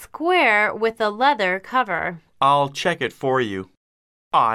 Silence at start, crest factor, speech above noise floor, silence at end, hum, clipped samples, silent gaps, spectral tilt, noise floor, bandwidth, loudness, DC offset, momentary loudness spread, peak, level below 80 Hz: 0 s; 16 dB; over 70 dB; 0 s; none; under 0.1%; 3.77-4.31 s; -4.5 dB/octave; under -90 dBFS; 15 kHz; -20 LUFS; under 0.1%; 8 LU; -4 dBFS; -62 dBFS